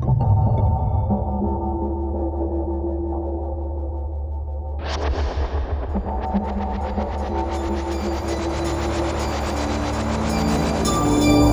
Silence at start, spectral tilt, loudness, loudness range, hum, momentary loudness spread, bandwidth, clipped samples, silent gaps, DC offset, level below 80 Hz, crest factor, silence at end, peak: 0 s; -6.5 dB/octave; -23 LUFS; 4 LU; none; 9 LU; over 20 kHz; under 0.1%; none; under 0.1%; -26 dBFS; 18 dB; 0 s; -4 dBFS